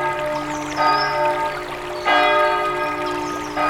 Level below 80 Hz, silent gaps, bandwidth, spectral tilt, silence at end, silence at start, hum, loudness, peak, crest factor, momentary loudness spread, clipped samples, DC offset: -48 dBFS; none; 16.5 kHz; -3.5 dB/octave; 0 s; 0 s; none; -20 LUFS; -4 dBFS; 16 dB; 9 LU; under 0.1%; under 0.1%